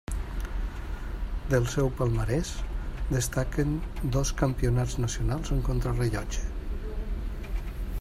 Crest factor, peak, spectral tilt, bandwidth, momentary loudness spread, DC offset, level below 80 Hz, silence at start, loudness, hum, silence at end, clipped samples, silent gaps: 18 dB; -10 dBFS; -6 dB/octave; 15 kHz; 10 LU; under 0.1%; -32 dBFS; 0.1 s; -30 LUFS; none; 0 s; under 0.1%; none